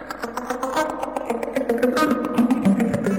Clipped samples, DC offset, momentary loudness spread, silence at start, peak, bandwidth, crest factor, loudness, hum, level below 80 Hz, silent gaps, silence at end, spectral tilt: under 0.1%; under 0.1%; 9 LU; 0 s; -6 dBFS; 18 kHz; 16 dB; -22 LUFS; none; -52 dBFS; none; 0 s; -6 dB/octave